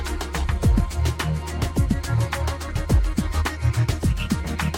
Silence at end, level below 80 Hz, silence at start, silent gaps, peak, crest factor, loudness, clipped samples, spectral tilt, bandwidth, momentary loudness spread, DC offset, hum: 0 s; -26 dBFS; 0 s; none; -6 dBFS; 16 dB; -24 LUFS; under 0.1%; -6 dB/octave; 17 kHz; 5 LU; under 0.1%; none